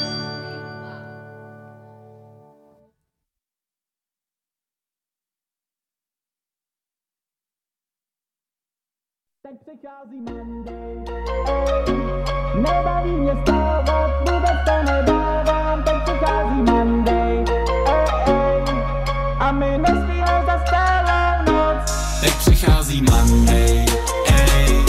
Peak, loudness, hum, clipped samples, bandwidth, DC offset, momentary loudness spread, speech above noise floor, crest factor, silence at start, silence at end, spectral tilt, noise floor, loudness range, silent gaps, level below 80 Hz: -4 dBFS; -18 LUFS; none; under 0.1%; 15.5 kHz; under 0.1%; 17 LU; over 72 dB; 16 dB; 0 s; 0 s; -5.5 dB/octave; under -90 dBFS; 14 LU; none; -24 dBFS